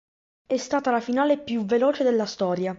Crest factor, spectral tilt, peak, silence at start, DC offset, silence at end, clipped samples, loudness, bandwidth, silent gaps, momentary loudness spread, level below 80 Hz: 14 dB; -5.5 dB/octave; -10 dBFS; 0.5 s; under 0.1%; 0 s; under 0.1%; -24 LUFS; 7.8 kHz; none; 5 LU; -66 dBFS